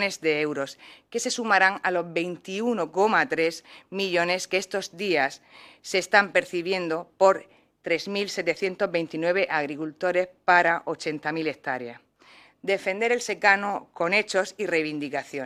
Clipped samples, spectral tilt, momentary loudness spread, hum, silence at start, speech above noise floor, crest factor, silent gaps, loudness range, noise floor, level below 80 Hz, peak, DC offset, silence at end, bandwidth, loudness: under 0.1%; -3.5 dB/octave; 11 LU; none; 0 s; 29 dB; 22 dB; none; 2 LU; -55 dBFS; -74 dBFS; -4 dBFS; under 0.1%; 0 s; 15 kHz; -25 LUFS